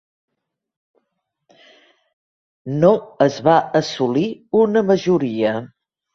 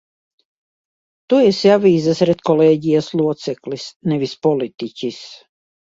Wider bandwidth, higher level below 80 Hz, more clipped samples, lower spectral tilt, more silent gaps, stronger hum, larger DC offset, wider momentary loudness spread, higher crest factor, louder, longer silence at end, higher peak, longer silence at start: about the same, 7.6 kHz vs 7.8 kHz; about the same, -60 dBFS vs -60 dBFS; neither; about the same, -6.5 dB/octave vs -6.5 dB/octave; second, none vs 3.96-4.00 s; neither; neither; second, 6 LU vs 14 LU; about the same, 18 dB vs 18 dB; about the same, -18 LUFS vs -17 LUFS; about the same, 0.45 s vs 0.5 s; about the same, -2 dBFS vs 0 dBFS; first, 2.65 s vs 1.3 s